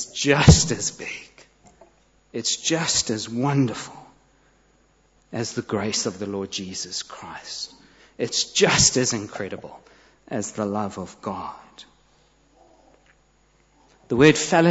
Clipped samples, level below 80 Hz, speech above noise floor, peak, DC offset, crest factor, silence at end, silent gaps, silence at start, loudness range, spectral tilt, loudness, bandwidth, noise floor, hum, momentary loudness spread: under 0.1%; -40 dBFS; 39 dB; -2 dBFS; under 0.1%; 22 dB; 0 s; none; 0 s; 10 LU; -4 dB/octave; -22 LUFS; 8.2 kHz; -61 dBFS; none; 20 LU